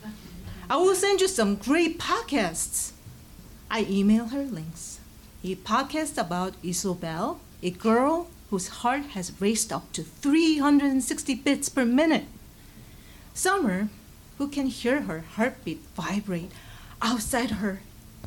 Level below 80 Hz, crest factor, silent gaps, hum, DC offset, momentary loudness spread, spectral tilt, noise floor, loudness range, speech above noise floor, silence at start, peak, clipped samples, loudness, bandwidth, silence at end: -50 dBFS; 14 dB; none; none; under 0.1%; 14 LU; -4 dB/octave; -48 dBFS; 5 LU; 22 dB; 0 s; -12 dBFS; under 0.1%; -26 LUFS; 18 kHz; 0 s